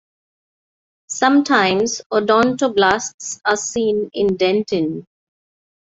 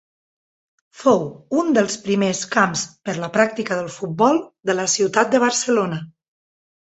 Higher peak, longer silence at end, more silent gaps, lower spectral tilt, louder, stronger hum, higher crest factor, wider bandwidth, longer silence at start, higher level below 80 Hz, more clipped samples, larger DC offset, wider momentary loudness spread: about the same, 0 dBFS vs -2 dBFS; first, 0.95 s vs 0.75 s; first, 2.06-2.10 s, 3.14-3.18 s vs none; about the same, -3.5 dB/octave vs -4 dB/octave; about the same, -17 LUFS vs -19 LUFS; neither; about the same, 18 dB vs 20 dB; about the same, 8 kHz vs 8.2 kHz; first, 1.1 s vs 0.95 s; first, -56 dBFS vs -62 dBFS; neither; neither; about the same, 8 LU vs 8 LU